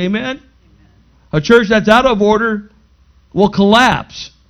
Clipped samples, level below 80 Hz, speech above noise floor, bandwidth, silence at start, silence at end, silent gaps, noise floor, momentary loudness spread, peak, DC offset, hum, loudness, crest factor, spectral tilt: 0.2%; -40 dBFS; 37 dB; 12.5 kHz; 0 s; 0.25 s; none; -49 dBFS; 15 LU; 0 dBFS; under 0.1%; none; -12 LUFS; 14 dB; -5.5 dB/octave